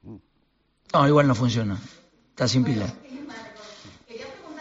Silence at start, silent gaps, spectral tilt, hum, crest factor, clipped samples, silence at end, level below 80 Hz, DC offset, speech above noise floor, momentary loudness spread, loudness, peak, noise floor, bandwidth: 0.05 s; none; -5.5 dB/octave; none; 20 dB; under 0.1%; 0 s; -56 dBFS; under 0.1%; 46 dB; 23 LU; -22 LUFS; -6 dBFS; -68 dBFS; 8 kHz